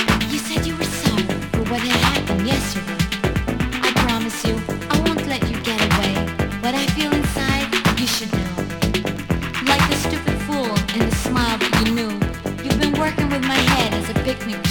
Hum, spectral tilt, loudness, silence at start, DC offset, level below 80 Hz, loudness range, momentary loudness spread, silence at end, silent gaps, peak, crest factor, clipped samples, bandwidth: none; -4.5 dB/octave; -20 LUFS; 0 s; under 0.1%; -32 dBFS; 1 LU; 6 LU; 0 s; none; -2 dBFS; 18 dB; under 0.1%; 17.5 kHz